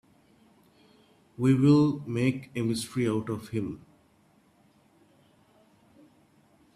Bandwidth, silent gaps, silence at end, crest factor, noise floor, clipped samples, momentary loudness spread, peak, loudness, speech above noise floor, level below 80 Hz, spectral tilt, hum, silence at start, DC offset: 14.5 kHz; none; 3 s; 20 dB; -64 dBFS; under 0.1%; 13 LU; -10 dBFS; -27 LUFS; 38 dB; -64 dBFS; -7 dB/octave; none; 1.4 s; under 0.1%